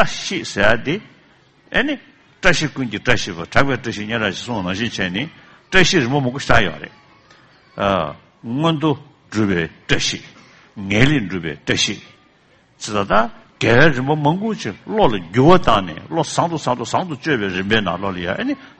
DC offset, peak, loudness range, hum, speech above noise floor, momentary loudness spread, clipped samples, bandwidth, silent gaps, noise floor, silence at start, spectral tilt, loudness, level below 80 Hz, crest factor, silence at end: under 0.1%; 0 dBFS; 5 LU; none; 36 dB; 12 LU; under 0.1%; 8.8 kHz; none; -54 dBFS; 0 s; -4.5 dB/octave; -18 LUFS; -40 dBFS; 18 dB; 0 s